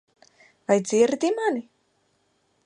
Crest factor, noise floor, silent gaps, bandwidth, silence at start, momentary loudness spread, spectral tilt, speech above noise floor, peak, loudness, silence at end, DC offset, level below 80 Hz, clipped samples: 20 dB; -69 dBFS; none; 11 kHz; 0.7 s; 11 LU; -4.5 dB/octave; 47 dB; -6 dBFS; -23 LUFS; 1.05 s; under 0.1%; -74 dBFS; under 0.1%